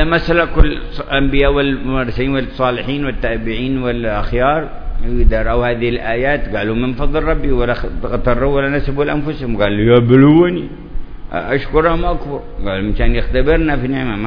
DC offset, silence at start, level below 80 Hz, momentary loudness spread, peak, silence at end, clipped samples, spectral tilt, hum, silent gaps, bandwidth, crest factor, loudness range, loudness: under 0.1%; 0 s; -20 dBFS; 11 LU; 0 dBFS; 0 s; 0.2%; -9.5 dB/octave; none; none; 5.4 kHz; 14 dB; 4 LU; -16 LUFS